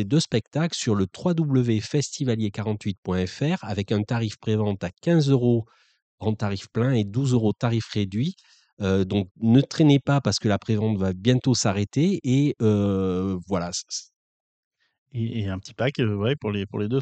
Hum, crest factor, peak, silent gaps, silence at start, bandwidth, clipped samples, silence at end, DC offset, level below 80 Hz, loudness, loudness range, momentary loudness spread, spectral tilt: none; 18 dB; -6 dBFS; 2.98-3.03 s, 6.02-6.18 s, 8.73-8.77 s, 9.31-9.35 s, 14.16-14.71 s, 14.98-15.06 s; 0 s; 9 kHz; under 0.1%; 0 s; under 0.1%; -56 dBFS; -24 LUFS; 5 LU; 8 LU; -6 dB/octave